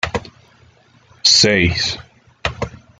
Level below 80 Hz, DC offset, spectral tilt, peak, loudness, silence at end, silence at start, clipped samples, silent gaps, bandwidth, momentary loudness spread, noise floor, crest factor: -42 dBFS; under 0.1%; -2.5 dB/octave; 0 dBFS; -14 LUFS; 0.25 s; 0.05 s; under 0.1%; none; 9.6 kHz; 17 LU; -51 dBFS; 20 dB